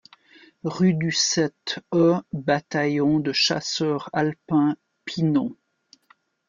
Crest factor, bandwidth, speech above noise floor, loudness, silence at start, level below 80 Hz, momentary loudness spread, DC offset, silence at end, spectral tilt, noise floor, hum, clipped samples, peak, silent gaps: 16 dB; 7.4 kHz; 39 dB; -23 LUFS; 0.65 s; -64 dBFS; 11 LU; under 0.1%; 0.95 s; -4.5 dB/octave; -61 dBFS; none; under 0.1%; -8 dBFS; none